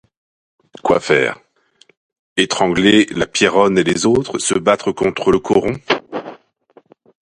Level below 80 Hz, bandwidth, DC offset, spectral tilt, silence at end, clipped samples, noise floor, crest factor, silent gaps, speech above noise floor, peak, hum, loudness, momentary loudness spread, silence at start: -48 dBFS; 11 kHz; under 0.1%; -4 dB/octave; 1.05 s; under 0.1%; -54 dBFS; 18 dB; 1.97-2.10 s, 2.19-2.36 s; 39 dB; 0 dBFS; none; -15 LUFS; 11 LU; 0.85 s